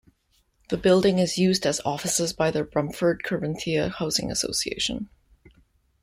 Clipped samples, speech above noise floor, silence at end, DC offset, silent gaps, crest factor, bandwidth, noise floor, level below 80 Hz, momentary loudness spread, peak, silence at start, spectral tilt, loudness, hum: under 0.1%; 43 dB; 0.95 s; under 0.1%; none; 20 dB; 15.5 kHz; -67 dBFS; -52 dBFS; 8 LU; -6 dBFS; 0.7 s; -4 dB/octave; -24 LUFS; none